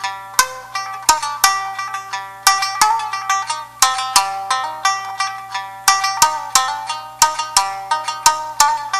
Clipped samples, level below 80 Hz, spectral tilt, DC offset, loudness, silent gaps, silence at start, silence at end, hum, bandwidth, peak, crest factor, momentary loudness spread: under 0.1%; -54 dBFS; 2 dB/octave; 0.3%; -17 LUFS; none; 0 s; 0 s; 60 Hz at -55 dBFS; over 20 kHz; 0 dBFS; 18 dB; 10 LU